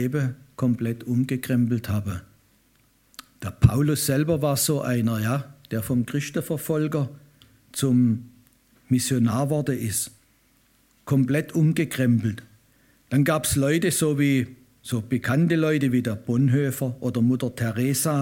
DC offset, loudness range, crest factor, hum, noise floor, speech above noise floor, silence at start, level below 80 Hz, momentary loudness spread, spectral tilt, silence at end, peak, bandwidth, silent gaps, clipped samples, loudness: under 0.1%; 3 LU; 22 dB; none; -62 dBFS; 39 dB; 0 s; -48 dBFS; 9 LU; -6 dB/octave; 0 s; -2 dBFS; 17 kHz; none; under 0.1%; -24 LUFS